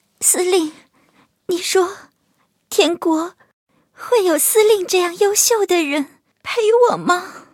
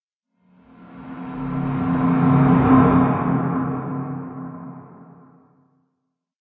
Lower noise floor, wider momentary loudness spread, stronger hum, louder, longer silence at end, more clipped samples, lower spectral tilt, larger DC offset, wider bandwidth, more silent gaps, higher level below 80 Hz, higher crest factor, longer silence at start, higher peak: second, -64 dBFS vs -76 dBFS; second, 12 LU vs 21 LU; neither; first, -16 LUFS vs -19 LUFS; second, 0.15 s vs 1.55 s; neither; second, -1.5 dB/octave vs -12.5 dB/octave; neither; first, 17 kHz vs 3.9 kHz; first, 3.53-3.67 s vs none; second, -70 dBFS vs -42 dBFS; about the same, 18 dB vs 18 dB; second, 0.2 s vs 0.8 s; about the same, 0 dBFS vs -2 dBFS